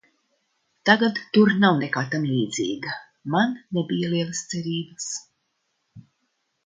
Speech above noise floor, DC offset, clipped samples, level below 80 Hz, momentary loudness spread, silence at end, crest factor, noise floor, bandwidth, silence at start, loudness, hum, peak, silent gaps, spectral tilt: 52 dB; under 0.1%; under 0.1%; -68 dBFS; 12 LU; 0.65 s; 24 dB; -74 dBFS; 9.4 kHz; 0.85 s; -23 LUFS; none; -2 dBFS; none; -5 dB/octave